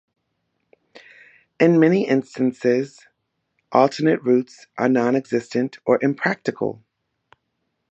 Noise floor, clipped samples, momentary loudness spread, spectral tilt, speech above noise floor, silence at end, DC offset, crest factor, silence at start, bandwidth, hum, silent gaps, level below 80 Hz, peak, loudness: -75 dBFS; under 0.1%; 9 LU; -7 dB/octave; 55 dB; 1.2 s; under 0.1%; 20 dB; 1.6 s; 8.2 kHz; none; none; -72 dBFS; -2 dBFS; -20 LUFS